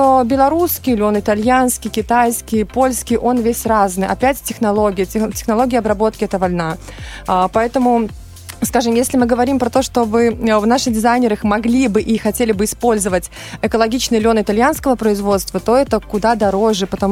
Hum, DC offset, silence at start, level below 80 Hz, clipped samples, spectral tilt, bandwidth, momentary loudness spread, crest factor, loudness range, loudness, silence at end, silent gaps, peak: none; under 0.1%; 0 s; -36 dBFS; under 0.1%; -4.5 dB/octave; 16.5 kHz; 5 LU; 14 dB; 2 LU; -15 LUFS; 0 s; none; -2 dBFS